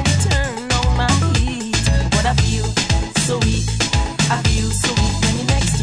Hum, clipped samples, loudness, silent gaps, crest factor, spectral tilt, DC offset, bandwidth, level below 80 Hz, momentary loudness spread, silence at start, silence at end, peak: none; under 0.1%; -17 LUFS; none; 14 dB; -4 dB/octave; under 0.1%; 11 kHz; -22 dBFS; 3 LU; 0 s; 0 s; -2 dBFS